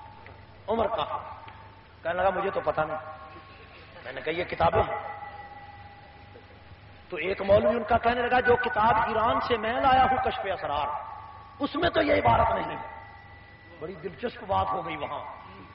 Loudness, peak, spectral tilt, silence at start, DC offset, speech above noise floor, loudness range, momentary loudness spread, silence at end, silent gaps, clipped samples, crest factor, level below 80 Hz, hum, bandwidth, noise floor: -26 LUFS; -10 dBFS; -3 dB/octave; 0 s; under 0.1%; 23 dB; 8 LU; 23 LU; 0 s; none; under 0.1%; 18 dB; -48 dBFS; 50 Hz at -55 dBFS; 5.6 kHz; -49 dBFS